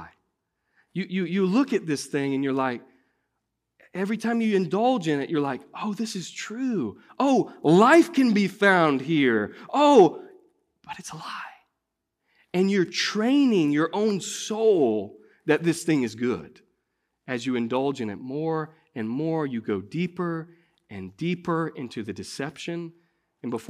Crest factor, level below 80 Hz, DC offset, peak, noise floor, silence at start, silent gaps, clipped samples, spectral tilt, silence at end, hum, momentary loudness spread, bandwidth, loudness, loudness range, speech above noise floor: 20 dB; -72 dBFS; under 0.1%; -4 dBFS; -82 dBFS; 0 s; none; under 0.1%; -5.5 dB/octave; 0.05 s; none; 17 LU; 14 kHz; -24 LUFS; 9 LU; 58 dB